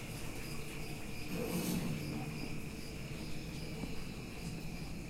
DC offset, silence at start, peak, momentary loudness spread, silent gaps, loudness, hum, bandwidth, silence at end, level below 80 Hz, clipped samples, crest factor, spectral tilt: under 0.1%; 0 s; -26 dBFS; 7 LU; none; -42 LUFS; none; 16 kHz; 0 s; -50 dBFS; under 0.1%; 16 dB; -5 dB/octave